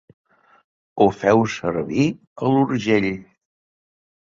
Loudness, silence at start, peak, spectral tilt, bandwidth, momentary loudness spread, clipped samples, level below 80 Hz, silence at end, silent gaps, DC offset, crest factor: -20 LUFS; 0.95 s; -2 dBFS; -6.5 dB/octave; 7.6 kHz; 8 LU; under 0.1%; -54 dBFS; 1.1 s; 2.27-2.36 s; under 0.1%; 20 dB